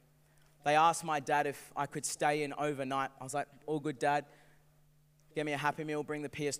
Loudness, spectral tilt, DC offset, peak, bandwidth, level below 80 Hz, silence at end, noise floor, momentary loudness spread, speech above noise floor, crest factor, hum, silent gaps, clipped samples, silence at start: -34 LUFS; -4 dB/octave; under 0.1%; -14 dBFS; 16 kHz; -74 dBFS; 0 s; -66 dBFS; 11 LU; 32 dB; 22 dB; none; none; under 0.1%; 0.65 s